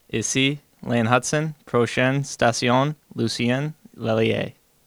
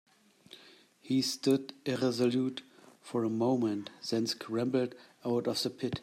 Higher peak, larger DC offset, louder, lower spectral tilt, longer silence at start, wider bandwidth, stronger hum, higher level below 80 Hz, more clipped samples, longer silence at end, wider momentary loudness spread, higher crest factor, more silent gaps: first, -2 dBFS vs -16 dBFS; neither; first, -22 LUFS vs -32 LUFS; about the same, -4.5 dB/octave vs -5 dB/octave; second, 0.15 s vs 1.05 s; first, 20 kHz vs 14.5 kHz; neither; first, -54 dBFS vs -72 dBFS; neither; first, 0.35 s vs 0 s; about the same, 8 LU vs 9 LU; about the same, 22 dB vs 18 dB; neither